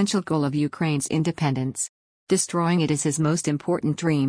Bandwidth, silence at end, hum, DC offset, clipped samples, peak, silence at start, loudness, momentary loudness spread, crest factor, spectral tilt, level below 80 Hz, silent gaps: 10.5 kHz; 0 s; none; under 0.1%; under 0.1%; -8 dBFS; 0 s; -24 LUFS; 4 LU; 16 dB; -5 dB/octave; -60 dBFS; 1.89-2.27 s